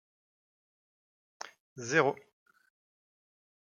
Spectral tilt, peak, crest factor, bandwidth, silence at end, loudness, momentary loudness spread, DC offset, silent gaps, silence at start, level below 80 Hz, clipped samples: -4 dB/octave; -12 dBFS; 26 dB; 9.6 kHz; 1.45 s; -29 LUFS; 20 LU; under 0.1%; 1.60-1.76 s; 1.45 s; -82 dBFS; under 0.1%